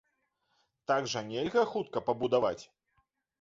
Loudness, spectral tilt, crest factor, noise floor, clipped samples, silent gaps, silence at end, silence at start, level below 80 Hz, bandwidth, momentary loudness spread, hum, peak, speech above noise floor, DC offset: -31 LUFS; -4.5 dB/octave; 18 dB; -78 dBFS; under 0.1%; none; 0.75 s; 0.9 s; -70 dBFS; 7.6 kHz; 6 LU; none; -14 dBFS; 47 dB; under 0.1%